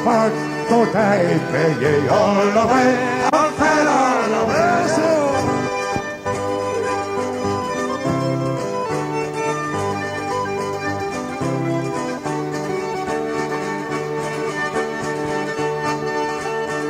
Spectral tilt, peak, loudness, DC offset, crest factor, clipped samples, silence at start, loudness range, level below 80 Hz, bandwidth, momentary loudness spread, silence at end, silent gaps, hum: -5.5 dB/octave; -4 dBFS; -20 LUFS; under 0.1%; 16 dB; under 0.1%; 0 s; 7 LU; -52 dBFS; 16 kHz; 8 LU; 0 s; none; none